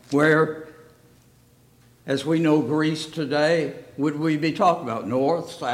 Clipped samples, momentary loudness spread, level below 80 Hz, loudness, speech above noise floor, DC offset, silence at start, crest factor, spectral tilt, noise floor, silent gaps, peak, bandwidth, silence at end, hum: under 0.1%; 9 LU; -66 dBFS; -22 LUFS; 34 dB; under 0.1%; 0.1 s; 16 dB; -6 dB/octave; -56 dBFS; none; -6 dBFS; 14 kHz; 0 s; 60 Hz at -60 dBFS